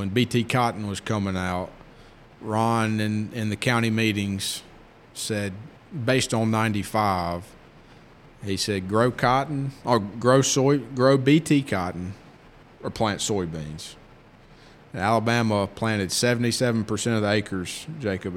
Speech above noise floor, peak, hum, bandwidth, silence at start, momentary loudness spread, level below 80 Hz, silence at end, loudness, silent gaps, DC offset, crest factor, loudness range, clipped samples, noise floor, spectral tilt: 27 dB; -4 dBFS; none; 16.5 kHz; 0 s; 15 LU; -54 dBFS; 0 s; -24 LUFS; none; under 0.1%; 20 dB; 5 LU; under 0.1%; -50 dBFS; -5 dB/octave